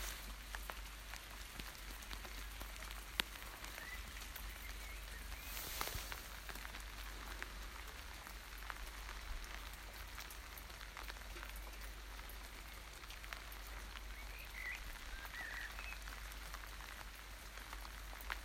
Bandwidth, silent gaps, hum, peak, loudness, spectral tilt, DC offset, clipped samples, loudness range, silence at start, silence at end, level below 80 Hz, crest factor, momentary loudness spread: 16 kHz; none; none; -12 dBFS; -49 LUFS; -2 dB/octave; under 0.1%; under 0.1%; 4 LU; 0 s; 0 s; -52 dBFS; 38 dB; 6 LU